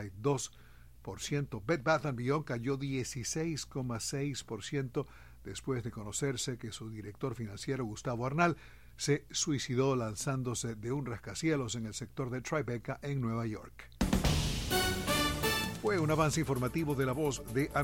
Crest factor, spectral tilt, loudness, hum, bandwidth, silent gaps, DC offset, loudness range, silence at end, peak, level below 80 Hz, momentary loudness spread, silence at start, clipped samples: 20 dB; -4.5 dB/octave; -34 LUFS; none; 16.5 kHz; none; 0.1%; 6 LU; 0 s; -16 dBFS; -48 dBFS; 10 LU; 0 s; under 0.1%